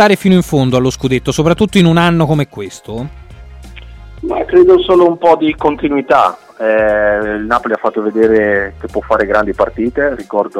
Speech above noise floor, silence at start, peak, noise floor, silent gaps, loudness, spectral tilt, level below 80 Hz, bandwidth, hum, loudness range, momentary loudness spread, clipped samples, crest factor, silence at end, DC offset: 21 dB; 0 s; 0 dBFS; -32 dBFS; none; -12 LUFS; -6.5 dB/octave; -36 dBFS; 15 kHz; none; 3 LU; 11 LU; under 0.1%; 12 dB; 0 s; under 0.1%